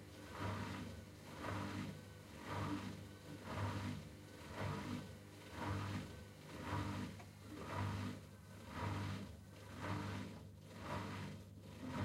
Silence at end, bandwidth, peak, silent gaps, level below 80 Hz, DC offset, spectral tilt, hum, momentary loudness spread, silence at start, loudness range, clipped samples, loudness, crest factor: 0 s; 16 kHz; -32 dBFS; none; -64 dBFS; under 0.1%; -6 dB/octave; none; 11 LU; 0 s; 1 LU; under 0.1%; -48 LUFS; 16 dB